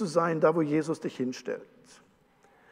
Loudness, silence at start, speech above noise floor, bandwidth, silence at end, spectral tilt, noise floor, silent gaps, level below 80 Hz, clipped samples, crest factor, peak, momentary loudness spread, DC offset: -29 LUFS; 0 s; 34 dB; 11 kHz; 1.1 s; -6.5 dB/octave; -63 dBFS; none; -78 dBFS; under 0.1%; 20 dB; -10 dBFS; 13 LU; under 0.1%